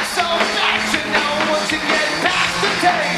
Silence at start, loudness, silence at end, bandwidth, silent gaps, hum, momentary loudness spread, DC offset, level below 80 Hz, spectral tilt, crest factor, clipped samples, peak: 0 s; -16 LUFS; 0 s; 13.5 kHz; none; none; 2 LU; under 0.1%; -48 dBFS; -2.5 dB/octave; 16 dB; under 0.1%; -2 dBFS